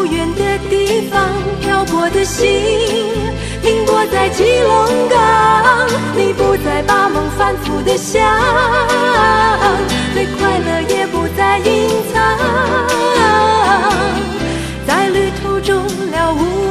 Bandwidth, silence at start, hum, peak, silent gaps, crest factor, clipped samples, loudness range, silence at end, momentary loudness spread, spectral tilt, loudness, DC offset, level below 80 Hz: 14 kHz; 0 s; none; 0 dBFS; none; 12 dB; under 0.1%; 3 LU; 0 s; 6 LU; -4.5 dB/octave; -13 LUFS; 0.1%; -30 dBFS